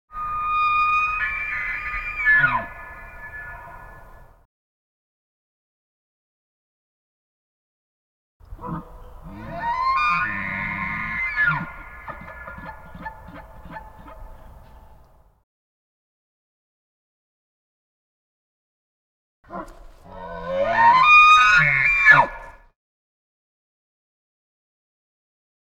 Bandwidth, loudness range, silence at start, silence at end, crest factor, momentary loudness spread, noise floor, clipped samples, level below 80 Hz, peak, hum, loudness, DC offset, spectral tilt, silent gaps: 16 kHz; 25 LU; 0.15 s; 3.2 s; 22 dB; 26 LU; -52 dBFS; under 0.1%; -46 dBFS; -2 dBFS; none; -17 LUFS; under 0.1%; -3.5 dB/octave; 4.45-8.40 s, 15.43-19.43 s